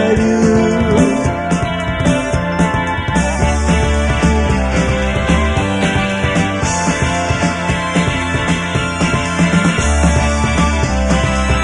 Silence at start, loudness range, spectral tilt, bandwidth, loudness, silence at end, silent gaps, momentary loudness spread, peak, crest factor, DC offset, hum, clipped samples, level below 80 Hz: 0 s; 1 LU; -5.5 dB/octave; 11 kHz; -15 LUFS; 0 s; none; 4 LU; 0 dBFS; 14 dB; under 0.1%; none; under 0.1%; -22 dBFS